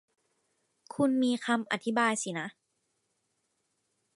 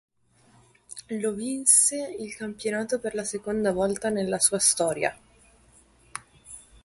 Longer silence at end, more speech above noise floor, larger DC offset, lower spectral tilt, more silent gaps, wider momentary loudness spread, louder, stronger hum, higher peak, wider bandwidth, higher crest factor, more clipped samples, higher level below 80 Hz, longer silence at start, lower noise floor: first, 1.65 s vs 0.25 s; first, 49 dB vs 35 dB; neither; first, -4 dB/octave vs -2.5 dB/octave; neither; second, 12 LU vs 23 LU; second, -30 LUFS vs -24 LUFS; neither; second, -12 dBFS vs -6 dBFS; about the same, 11.5 kHz vs 12 kHz; about the same, 20 dB vs 22 dB; neither; second, -78 dBFS vs -60 dBFS; about the same, 0.9 s vs 0.9 s; first, -79 dBFS vs -61 dBFS